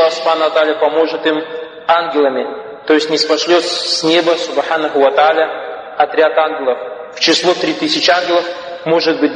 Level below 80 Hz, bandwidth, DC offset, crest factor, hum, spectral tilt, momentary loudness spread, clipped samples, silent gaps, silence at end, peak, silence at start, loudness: -64 dBFS; 10 kHz; under 0.1%; 14 dB; none; -3 dB/octave; 11 LU; under 0.1%; none; 0 s; 0 dBFS; 0 s; -13 LUFS